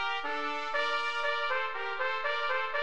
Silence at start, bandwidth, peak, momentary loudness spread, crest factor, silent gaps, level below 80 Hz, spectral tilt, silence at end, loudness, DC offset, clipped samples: 0 s; 10 kHz; -18 dBFS; 3 LU; 16 dB; none; -66 dBFS; -1.5 dB/octave; 0 s; -31 LUFS; 0.8%; under 0.1%